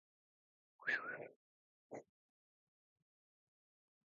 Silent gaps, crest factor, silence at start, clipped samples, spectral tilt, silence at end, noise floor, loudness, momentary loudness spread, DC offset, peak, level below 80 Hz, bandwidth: 1.36-1.90 s; 26 dB; 0.8 s; under 0.1%; 3 dB/octave; 2.15 s; under -90 dBFS; -43 LUFS; 16 LU; under 0.1%; -26 dBFS; under -90 dBFS; 3.2 kHz